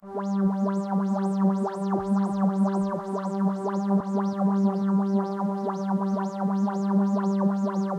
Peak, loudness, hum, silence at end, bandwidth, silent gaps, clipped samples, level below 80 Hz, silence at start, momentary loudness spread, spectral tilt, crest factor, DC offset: -12 dBFS; -26 LUFS; none; 0 s; 8.6 kHz; none; under 0.1%; -66 dBFS; 0.05 s; 4 LU; -9 dB/octave; 12 dB; under 0.1%